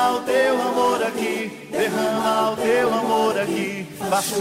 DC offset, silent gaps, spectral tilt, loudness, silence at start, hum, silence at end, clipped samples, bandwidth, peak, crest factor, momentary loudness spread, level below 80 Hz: under 0.1%; none; -3.5 dB/octave; -21 LUFS; 0 s; none; 0 s; under 0.1%; 16 kHz; -8 dBFS; 12 dB; 6 LU; -62 dBFS